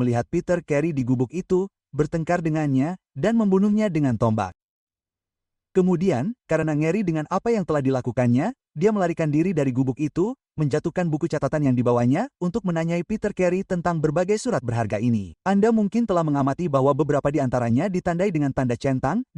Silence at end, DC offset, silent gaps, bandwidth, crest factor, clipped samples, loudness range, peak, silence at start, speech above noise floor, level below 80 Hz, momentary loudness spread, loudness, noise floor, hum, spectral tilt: 0.15 s; under 0.1%; 4.63-4.87 s; 11 kHz; 16 dB; under 0.1%; 2 LU; -8 dBFS; 0 s; over 68 dB; -50 dBFS; 5 LU; -23 LUFS; under -90 dBFS; none; -8 dB/octave